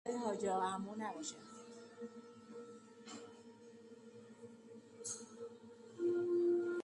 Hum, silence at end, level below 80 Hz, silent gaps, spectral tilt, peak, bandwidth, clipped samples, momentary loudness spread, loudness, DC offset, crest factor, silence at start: none; 0 s; -86 dBFS; none; -4.5 dB/octave; -26 dBFS; 11.5 kHz; under 0.1%; 22 LU; -41 LUFS; under 0.1%; 16 dB; 0.05 s